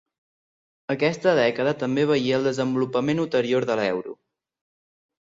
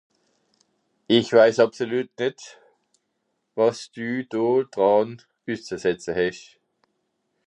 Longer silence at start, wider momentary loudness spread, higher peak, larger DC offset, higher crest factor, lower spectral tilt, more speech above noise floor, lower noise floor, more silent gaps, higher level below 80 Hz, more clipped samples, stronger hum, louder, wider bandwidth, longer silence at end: second, 0.9 s vs 1.1 s; second, 8 LU vs 16 LU; about the same, -6 dBFS vs -4 dBFS; neither; about the same, 18 dB vs 20 dB; about the same, -6 dB/octave vs -5 dB/octave; first, over 68 dB vs 53 dB; first, under -90 dBFS vs -75 dBFS; neither; about the same, -66 dBFS vs -64 dBFS; neither; neither; about the same, -23 LUFS vs -22 LUFS; second, 7.8 kHz vs 10 kHz; about the same, 1.05 s vs 1.1 s